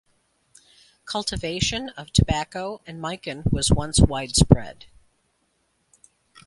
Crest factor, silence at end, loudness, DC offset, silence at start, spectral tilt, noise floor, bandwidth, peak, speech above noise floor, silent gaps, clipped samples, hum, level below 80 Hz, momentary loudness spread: 24 dB; 1.75 s; -23 LUFS; under 0.1%; 1.05 s; -4.5 dB/octave; -69 dBFS; 11.5 kHz; 0 dBFS; 47 dB; none; under 0.1%; none; -34 dBFS; 14 LU